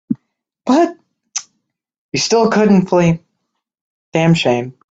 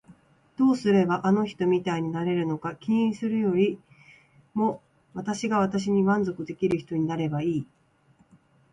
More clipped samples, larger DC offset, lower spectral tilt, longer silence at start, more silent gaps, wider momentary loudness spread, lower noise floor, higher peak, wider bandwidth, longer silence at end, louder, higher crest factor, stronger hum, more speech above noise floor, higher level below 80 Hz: neither; neither; second, -5.5 dB/octave vs -7 dB/octave; about the same, 0.1 s vs 0.1 s; first, 1.98-2.09 s, 3.81-4.12 s vs none; first, 14 LU vs 10 LU; first, -73 dBFS vs -62 dBFS; first, 0 dBFS vs -10 dBFS; second, 8 kHz vs 10.5 kHz; second, 0.2 s vs 1.1 s; first, -15 LUFS vs -26 LUFS; about the same, 16 dB vs 16 dB; neither; first, 60 dB vs 37 dB; first, -52 dBFS vs -64 dBFS